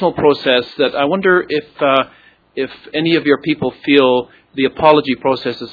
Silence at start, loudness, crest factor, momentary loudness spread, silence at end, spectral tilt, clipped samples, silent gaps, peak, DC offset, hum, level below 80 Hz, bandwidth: 0 s; -15 LUFS; 14 dB; 12 LU; 0 s; -7.5 dB/octave; under 0.1%; none; 0 dBFS; under 0.1%; none; -54 dBFS; 5.4 kHz